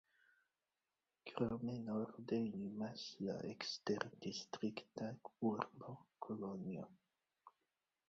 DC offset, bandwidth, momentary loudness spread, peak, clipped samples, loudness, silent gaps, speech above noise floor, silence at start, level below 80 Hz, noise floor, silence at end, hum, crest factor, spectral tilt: under 0.1%; 7.6 kHz; 10 LU; -22 dBFS; under 0.1%; -46 LUFS; none; over 45 dB; 1.25 s; -78 dBFS; under -90 dBFS; 0.6 s; none; 24 dB; -5 dB/octave